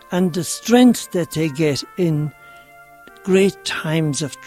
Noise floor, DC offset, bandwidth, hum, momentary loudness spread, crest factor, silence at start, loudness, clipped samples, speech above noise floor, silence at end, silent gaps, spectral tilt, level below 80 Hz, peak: -44 dBFS; under 0.1%; 15.5 kHz; none; 10 LU; 18 dB; 0.1 s; -18 LUFS; under 0.1%; 27 dB; 0 s; none; -5.5 dB/octave; -56 dBFS; -2 dBFS